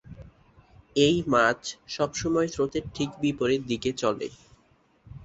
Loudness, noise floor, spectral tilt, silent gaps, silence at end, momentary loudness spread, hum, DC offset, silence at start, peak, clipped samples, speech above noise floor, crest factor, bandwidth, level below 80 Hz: -26 LUFS; -63 dBFS; -4.5 dB/octave; none; 0 s; 11 LU; none; under 0.1%; 0.1 s; -8 dBFS; under 0.1%; 37 dB; 20 dB; 8.2 kHz; -54 dBFS